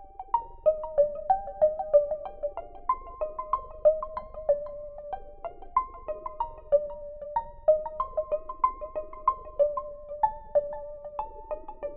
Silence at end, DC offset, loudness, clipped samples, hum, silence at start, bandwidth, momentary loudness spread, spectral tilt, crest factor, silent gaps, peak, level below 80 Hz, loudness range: 0 s; under 0.1%; -30 LUFS; under 0.1%; none; 0 s; 3.3 kHz; 14 LU; -5.5 dB/octave; 20 dB; none; -10 dBFS; -48 dBFS; 4 LU